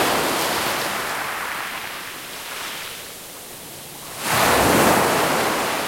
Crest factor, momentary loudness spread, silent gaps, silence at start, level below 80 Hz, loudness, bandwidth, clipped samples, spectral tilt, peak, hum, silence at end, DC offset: 18 dB; 19 LU; none; 0 s; -48 dBFS; -21 LUFS; 16.5 kHz; under 0.1%; -2.5 dB/octave; -4 dBFS; none; 0 s; under 0.1%